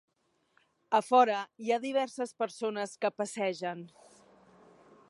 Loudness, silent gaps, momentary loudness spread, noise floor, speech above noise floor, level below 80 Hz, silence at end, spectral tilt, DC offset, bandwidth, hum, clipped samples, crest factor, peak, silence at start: -31 LUFS; none; 13 LU; -72 dBFS; 42 dB; -88 dBFS; 1.25 s; -4 dB/octave; under 0.1%; 11.5 kHz; none; under 0.1%; 22 dB; -10 dBFS; 0.9 s